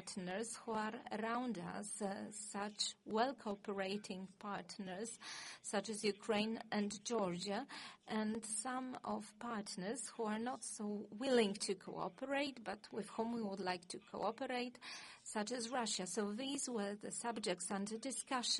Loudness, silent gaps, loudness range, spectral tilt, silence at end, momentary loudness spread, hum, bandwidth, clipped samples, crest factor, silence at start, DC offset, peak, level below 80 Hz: -43 LUFS; none; 2 LU; -3.5 dB/octave; 0 s; 8 LU; none; 11.5 kHz; under 0.1%; 20 dB; 0 s; under 0.1%; -22 dBFS; -82 dBFS